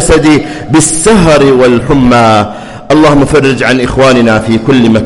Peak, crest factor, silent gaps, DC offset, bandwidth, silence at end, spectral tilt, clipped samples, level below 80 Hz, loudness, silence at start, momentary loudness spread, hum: 0 dBFS; 6 dB; none; under 0.1%; 12 kHz; 0 s; -5 dB/octave; 0.2%; -24 dBFS; -6 LUFS; 0 s; 5 LU; none